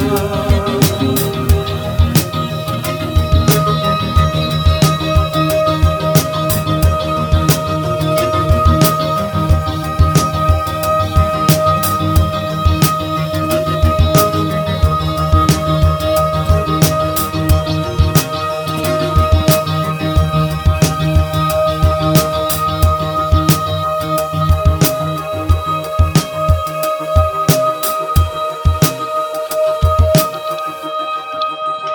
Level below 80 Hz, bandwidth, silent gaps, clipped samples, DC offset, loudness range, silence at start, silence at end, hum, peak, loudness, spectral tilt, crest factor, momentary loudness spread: -22 dBFS; over 20 kHz; none; under 0.1%; under 0.1%; 2 LU; 0 s; 0 s; none; 0 dBFS; -14 LUFS; -5.5 dB/octave; 14 dB; 6 LU